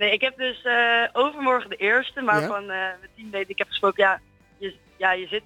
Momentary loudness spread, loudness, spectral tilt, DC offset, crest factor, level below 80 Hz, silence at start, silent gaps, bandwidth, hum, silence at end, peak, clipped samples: 14 LU; -22 LUFS; -4.5 dB/octave; under 0.1%; 18 dB; -62 dBFS; 0 s; none; 17 kHz; none; 0.05 s; -6 dBFS; under 0.1%